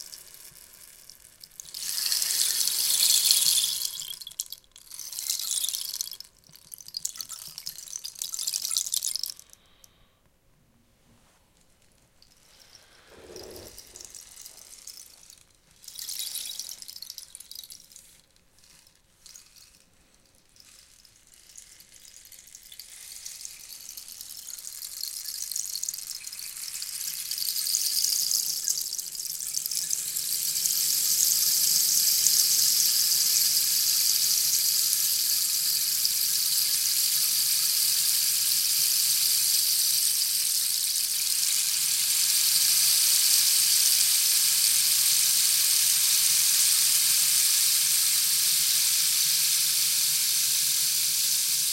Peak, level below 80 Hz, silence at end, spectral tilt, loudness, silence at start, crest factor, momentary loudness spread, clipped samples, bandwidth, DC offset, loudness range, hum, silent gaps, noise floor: -2 dBFS; -68 dBFS; 0 s; 3.5 dB/octave; -22 LUFS; 0 s; 26 dB; 20 LU; under 0.1%; 17 kHz; under 0.1%; 18 LU; none; none; -63 dBFS